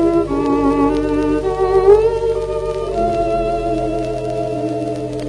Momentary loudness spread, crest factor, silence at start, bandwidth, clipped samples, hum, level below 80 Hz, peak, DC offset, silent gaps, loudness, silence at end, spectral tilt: 9 LU; 16 dB; 0 s; 10.5 kHz; under 0.1%; none; -32 dBFS; 0 dBFS; under 0.1%; none; -17 LUFS; 0 s; -7.5 dB/octave